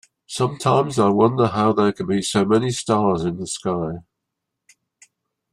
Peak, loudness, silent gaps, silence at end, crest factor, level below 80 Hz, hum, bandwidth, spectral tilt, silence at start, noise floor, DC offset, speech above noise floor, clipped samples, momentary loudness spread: -4 dBFS; -20 LUFS; none; 1.5 s; 18 dB; -56 dBFS; none; 13 kHz; -5.5 dB/octave; 0.3 s; -80 dBFS; under 0.1%; 61 dB; under 0.1%; 9 LU